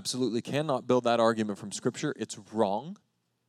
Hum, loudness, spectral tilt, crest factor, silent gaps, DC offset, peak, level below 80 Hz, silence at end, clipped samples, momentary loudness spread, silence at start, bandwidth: none; -30 LUFS; -5 dB/octave; 18 dB; none; under 0.1%; -12 dBFS; -82 dBFS; 0.55 s; under 0.1%; 10 LU; 0 s; 14.5 kHz